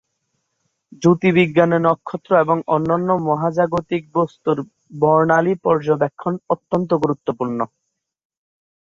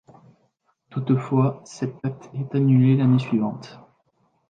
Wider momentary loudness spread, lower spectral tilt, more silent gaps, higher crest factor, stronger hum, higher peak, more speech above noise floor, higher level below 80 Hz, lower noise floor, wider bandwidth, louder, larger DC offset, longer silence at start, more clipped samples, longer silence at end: second, 9 LU vs 14 LU; about the same, -8 dB/octave vs -9 dB/octave; neither; about the same, 16 dB vs 16 dB; neither; first, -2 dBFS vs -8 dBFS; first, 55 dB vs 47 dB; first, -58 dBFS vs -66 dBFS; first, -72 dBFS vs -68 dBFS; about the same, 7.6 kHz vs 7.6 kHz; first, -18 LUFS vs -22 LUFS; neither; about the same, 0.9 s vs 0.95 s; neither; first, 1.15 s vs 0.75 s